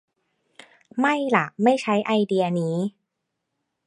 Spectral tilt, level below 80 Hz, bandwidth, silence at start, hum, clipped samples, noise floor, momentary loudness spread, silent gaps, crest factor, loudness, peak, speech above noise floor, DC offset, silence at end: -6.5 dB/octave; -74 dBFS; 11.5 kHz; 0.95 s; none; under 0.1%; -80 dBFS; 8 LU; none; 22 dB; -22 LUFS; -2 dBFS; 58 dB; under 0.1%; 1 s